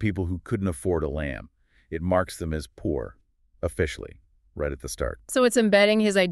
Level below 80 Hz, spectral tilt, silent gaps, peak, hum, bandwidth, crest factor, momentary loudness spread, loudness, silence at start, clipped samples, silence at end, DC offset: -42 dBFS; -5 dB/octave; none; -6 dBFS; none; 13.5 kHz; 20 dB; 17 LU; -25 LUFS; 0 s; under 0.1%; 0 s; under 0.1%